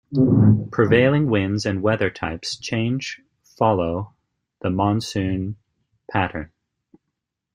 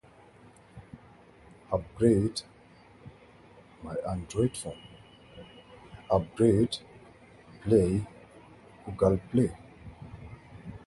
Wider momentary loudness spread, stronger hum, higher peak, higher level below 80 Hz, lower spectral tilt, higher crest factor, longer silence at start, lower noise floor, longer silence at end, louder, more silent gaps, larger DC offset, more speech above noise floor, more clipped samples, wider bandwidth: second, 16 LU vs 26 LU; neither; first, -2 dBFS vs -10 dBFS; about the same, -50 dBFS vs -50 dBFS; about the same, -7 dB/octave vs -7 dB/octave; about the same, 20 dB vs 22 dB; second, 0.1 s vs 0.75 s; first, -80 dBFS vs -56 dBFS; first, 1.1 s vs 0.1 s; first, -21 LUFS vs -28 LUFS; neither; neither; first, 60 dB vs 29 dB; neither; about the same, 10.5 kHz vs 11.5 kHz